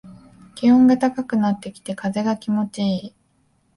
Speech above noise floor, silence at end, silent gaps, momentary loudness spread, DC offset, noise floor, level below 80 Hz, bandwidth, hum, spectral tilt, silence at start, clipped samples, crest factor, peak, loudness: 44 dB; 0.7 s; none; 14 LU; under 0.1%; -63 dBFS; -58 dBFS; 11.5 kHz; none; -7 dB/octave; 0.05 s; under 0.1%; 14 dB; -6 dBFS; -20 LUFS